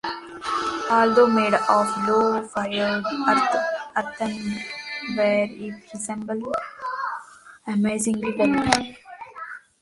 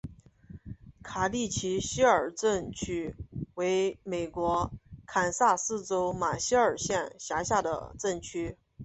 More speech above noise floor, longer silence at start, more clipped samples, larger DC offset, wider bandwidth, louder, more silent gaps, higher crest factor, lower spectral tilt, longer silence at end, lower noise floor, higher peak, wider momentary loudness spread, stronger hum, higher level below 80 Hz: about the same, 23 dB vs 22 dB; about the same, 0.05 s vs 0.05 s; neither; neither; first, 11.5 kHz vs 8.4 kHz; first, -23 LUFS vs -30 LUFS; neither; about the same, 22 dB vs 20 dB; about the same, -4 dB/octave vs -4 dB/octave; first, 0.25 s vs 0 s; second, -45 dBFS vs -51 dBFS; first, 0 dBFS vs -10 dBFS; about the same, 17 LU vs 15 LU; neither; about the same, -56 dBFS vs -52 dBFS